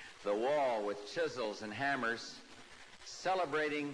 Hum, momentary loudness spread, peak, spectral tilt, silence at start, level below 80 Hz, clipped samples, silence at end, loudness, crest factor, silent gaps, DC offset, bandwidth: none; 19 LU; -24 dBFS; -4 dB/octave; 0 s; -74 dBFS; under 0.1%; 0 s; -36 LUFS; 14 dB; none; under 0.1%; 11 kHz